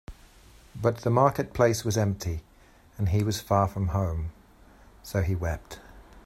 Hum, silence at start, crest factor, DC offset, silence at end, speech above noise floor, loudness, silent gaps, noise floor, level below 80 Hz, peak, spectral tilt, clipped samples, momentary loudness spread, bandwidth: none; 0.1 s; 22 dB; under 0.1%; 0.05 s; 30 dB; -27 LUFS; none; -56 dBFS; -44 dBFS; -6 dBFS; -6 dB/octave; under 0.1%; 16 LU; 16 kHz